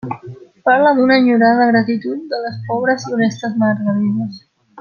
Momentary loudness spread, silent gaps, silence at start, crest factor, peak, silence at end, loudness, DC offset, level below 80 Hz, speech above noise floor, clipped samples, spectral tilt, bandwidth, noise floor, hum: 12 LU; none; 0.05 s; 14 dB; -2 dBFS; 0 s; -15 LUFS; under 0.1%; -60 dBFS; 21 dB; under 0.1%; -6.5 dB/octave; 7 kHz; -36 dBFS; none